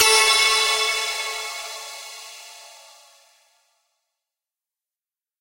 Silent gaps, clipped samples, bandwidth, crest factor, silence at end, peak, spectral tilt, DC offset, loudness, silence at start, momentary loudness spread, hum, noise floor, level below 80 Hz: none; under 0.1%; 16 kHz; 22 dB; 2.65 s; -2 dBFS; 3 dB/octave; under 0.1%; -18 LUFS; 0 s; 25 LU; none; under -90 dBFS; -60 dBFS